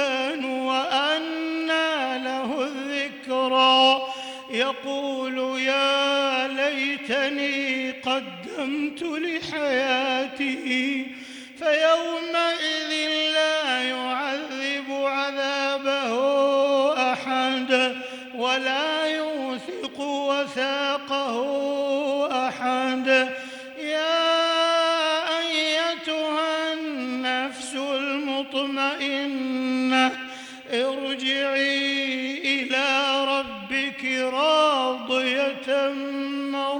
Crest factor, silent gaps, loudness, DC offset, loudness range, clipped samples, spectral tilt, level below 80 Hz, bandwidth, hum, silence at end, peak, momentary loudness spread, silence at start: 16 dB; none; -23 LUFS; under 0.1%; 3 LU; under 0.1%; -2 dB/octave; -72 dBFS; 19 kHz; none; 0 s; -8 dBFS; 8 LU; 0 s